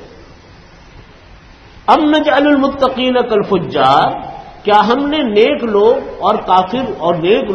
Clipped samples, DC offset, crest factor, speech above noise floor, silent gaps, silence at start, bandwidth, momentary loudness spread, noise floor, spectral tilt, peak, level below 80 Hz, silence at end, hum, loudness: under 0.1%; under 0.1%; 14 dB; 28 dB; none; 0 s; 8.4 kHz; 6 LU; -39 dBFS; -6.5 dB/octave; 0 dBFS; -42 dBFS; 0 s; none; -13 LUFS